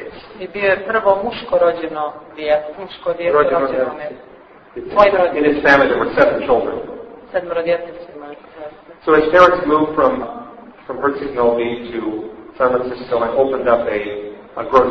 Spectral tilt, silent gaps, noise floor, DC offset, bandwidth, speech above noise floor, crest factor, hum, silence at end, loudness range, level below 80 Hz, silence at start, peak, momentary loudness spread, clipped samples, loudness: -6.5 dB/octave; none; -36 dBFS; under 0.1%; 6.4 kHz; 20 dB; 16 dB; none; 0 s; 4 LU; -46 dBFS; 0 s; 0 dBFS; 21 LU; under 0.1%; -16 LUFS